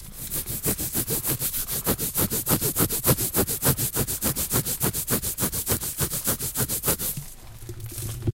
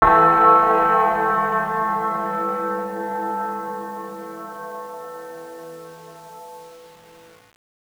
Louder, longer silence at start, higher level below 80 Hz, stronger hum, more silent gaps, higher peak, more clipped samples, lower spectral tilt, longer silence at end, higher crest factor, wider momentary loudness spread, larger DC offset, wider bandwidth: second, -24 LUFS vs -19 LUFS; about the same, 0 s vs 0 s; first, -42 dBFS vs -48 dBFS; neither; neither; about the same, -2 dBFS vs 0 dBFS; neither; second, -3.5 dB/octave vs -6 dB/octave; second, 0.1 s vs 0.95 s; about the same, 24 dB vs 22 dB; second, 9 LU vs 26 LU; neither; second, 17 kHz vs over 20 kHz